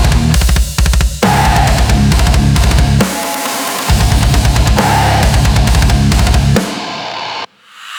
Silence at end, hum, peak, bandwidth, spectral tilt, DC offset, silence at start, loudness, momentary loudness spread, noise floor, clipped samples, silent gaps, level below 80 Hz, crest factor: 0 s; none; 0 dBFS; over 20 kHz; -5 dB/octave; under 0.1%; 0 s; -11 LUFS; 9 LU; -33 dBFS; under 0.1%; none; -14 dBFS; 10 dB